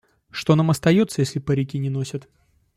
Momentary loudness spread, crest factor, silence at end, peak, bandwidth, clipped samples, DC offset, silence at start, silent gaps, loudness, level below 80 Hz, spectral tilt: 13 LU; 18 dB; 0.55 s; -4 dBFS; 15 kHz; under 0.1%; under 0.1%; 0.35 s; none; -21 LUFS; -54 dBFS; -6.5 dB/octave